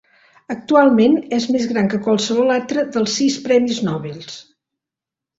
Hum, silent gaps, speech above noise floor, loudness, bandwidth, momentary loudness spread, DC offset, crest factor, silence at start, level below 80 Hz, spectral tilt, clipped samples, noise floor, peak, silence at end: none; none; 70 dB; -17 LUFS; 8 kHz; 17 LU; under 0.1%; 16 dB; 0.5 s; -60 dBFS; -5 dB/octave; under 0.1%; -86 dBFS; -2 dBFS; 0.95 s